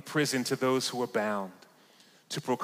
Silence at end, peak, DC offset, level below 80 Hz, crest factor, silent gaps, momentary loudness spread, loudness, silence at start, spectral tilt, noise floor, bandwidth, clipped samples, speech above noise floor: 0 s; -16 dBFS; under 0.1%; -82 dBFS; 16 dB; none; 10 LU; -31 LUFS; 0.05 s; -4 dB/octave; -60 dBFS; 16 kHz; under 0.1%; 30 dB